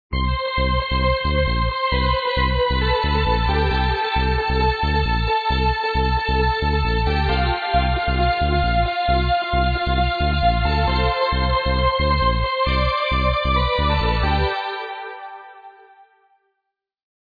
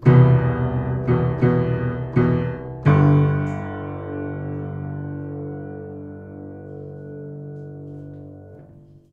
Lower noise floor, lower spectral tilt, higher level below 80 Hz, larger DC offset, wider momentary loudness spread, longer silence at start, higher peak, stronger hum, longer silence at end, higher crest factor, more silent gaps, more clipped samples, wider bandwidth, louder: first, -79 dBFS vs -47 dBFS; second, -7.5 dB/octave vs -10.5 dB/octave; first, -24 dBFS vs -42 dBFS; neither; second, 2 LU vs 21 LU; about the same, 0.1 s vs 0 s; about the same, -4 dBFS vs -2 dBFS; neither; first, 1.7 s vs 0.15 s; second, 14 dB vs 20 dB; neither; neither; first, 5 kHz vs 4.3 kHz; about the same, -20 LUFS vs -21 LUFS